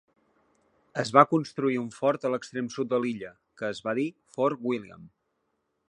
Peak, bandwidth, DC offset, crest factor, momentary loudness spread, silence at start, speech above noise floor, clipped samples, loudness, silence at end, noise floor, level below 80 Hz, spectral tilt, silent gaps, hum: -2 dBFS; 11 kHz; under 0.1%; 26 dB; 15 LU; 0.95 s; 50 dB; under 0.1%; -28 LUFS; 0.8 s; -77 dBFS; -74 dBFS; -6 dB/octave; none; none